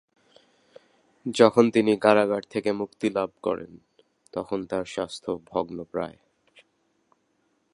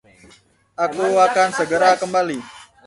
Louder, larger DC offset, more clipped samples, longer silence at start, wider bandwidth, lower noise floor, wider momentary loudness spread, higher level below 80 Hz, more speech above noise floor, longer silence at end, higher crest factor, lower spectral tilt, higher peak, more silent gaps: second, -25 LUFS vs -18 LUFS; neither; neither; first, 1.25 s vs 0.8 s; about the same, 11.5 kHz vs 11.5 kHz; first, -71 dBFS vs -52 dBFS; first, 15 LU vs 10 LU; about the same, -64 dBFS vs -62 dBFS; first, 46 dB vs 35 dB; first, 1.65 s vs 0.25 s; first, 26 dB vs 18 dB; first, -5.5 dB/octave vs -3.5 dB/octave; about the same, -2 dBFS vs -2 dBFS; neither